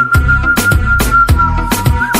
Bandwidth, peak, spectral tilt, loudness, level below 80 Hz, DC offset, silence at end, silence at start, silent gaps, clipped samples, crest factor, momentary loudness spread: 16.5 kHz; 0 dBFS; -5 dB/octave; -10 LUFS; -16 dBFS; under 0.1%; 0 s; 0 s; none; under 0.1%; 10 dB; 4 LU